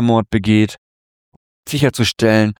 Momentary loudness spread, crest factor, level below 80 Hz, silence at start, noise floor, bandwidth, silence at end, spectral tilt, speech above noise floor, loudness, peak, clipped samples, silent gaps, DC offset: 9 LU; 14 dB; -44 dBFS; 0 s; under -90 dBFS; 18.5 kHz; 0.05 s; -6 dB/octave; over 75 dB; -16 LUFS; -2 dBFS; under 0.1%; 0.78-1.63 s; under 0.1%